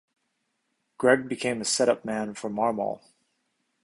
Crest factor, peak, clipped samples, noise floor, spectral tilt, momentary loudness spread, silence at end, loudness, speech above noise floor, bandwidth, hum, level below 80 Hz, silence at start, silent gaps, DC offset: 22 dB; -6 dBFS; under 0.1%; -77 dBFS; -3.5 dB/octave; 9 LU; 0.85 s; -26 LUFS; 51 dB; 11.5 kHz; none; -68 dBFS; 1 s; none; under 0.1%